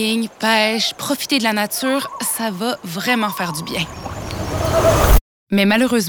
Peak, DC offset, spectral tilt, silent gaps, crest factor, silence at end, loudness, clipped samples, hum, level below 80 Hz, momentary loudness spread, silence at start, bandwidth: -2 dBFS; under 0.1%; -4 dB/octave; 5.21-5.47 s; 16 dB; 0 s; -18 LUFS; under 0.1%; none; -26 dBFS; 9 LU; 0 s; over 20 kHz